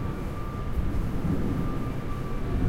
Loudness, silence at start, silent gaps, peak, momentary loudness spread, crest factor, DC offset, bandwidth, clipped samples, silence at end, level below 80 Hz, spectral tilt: -31 LUFS; 0 s; none; -14 dBFS; 6 LU; 14 dB; under 0.1%; 16 kHz; under 0.1%; 0 s; -32 dBFS; -8 dB/octave